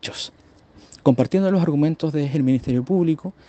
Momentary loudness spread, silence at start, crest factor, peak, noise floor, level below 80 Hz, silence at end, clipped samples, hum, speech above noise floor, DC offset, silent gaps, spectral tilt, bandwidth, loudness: 7 LU; 0.05 s; 20 dB; 0 dBFS; -50 dBFS; -54 dBFS; 0.15 s; under 0.1%; none; 30 dB; under 0.1%; none; -7.5 dB/octave; 8.6 kHz; -20 LUFS